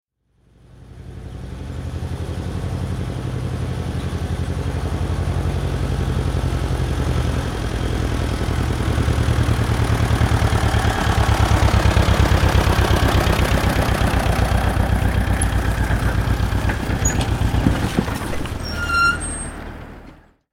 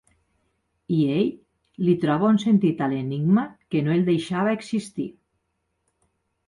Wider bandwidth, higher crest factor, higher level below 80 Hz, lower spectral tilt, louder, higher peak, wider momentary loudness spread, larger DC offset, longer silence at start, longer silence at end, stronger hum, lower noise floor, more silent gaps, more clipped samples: first, 16.5 kHz vs 11 kHz; about the same, 18 dB vs 14 dB; first, -24 dBFS vs -64 dBFS; second, -5.5 dB/octave vs -7.5 dB/octave; first, -20 LUFS vs -23 LUFS; first, 0 dBFS vs -10 dBFS; first, 11 LU vs 8 LU; neither; about the same, 0.8 s vs 0.9 s; second, 0.4 s vs 1.35 s; neither; second, -59 dBFS vs -75 dBFS; neither; neither